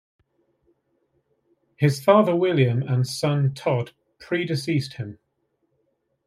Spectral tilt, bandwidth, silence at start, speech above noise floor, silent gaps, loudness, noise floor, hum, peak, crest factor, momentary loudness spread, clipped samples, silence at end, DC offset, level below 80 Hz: -7 dB/octave; 15 kHz; 1.8 s; 51 dB; none; -22 LUFS; -72 dBFS; none; -4 dBFS; 20 dB; 14 LU; under 0.1%; 1.1 s; under 0.1%; -66 dBFS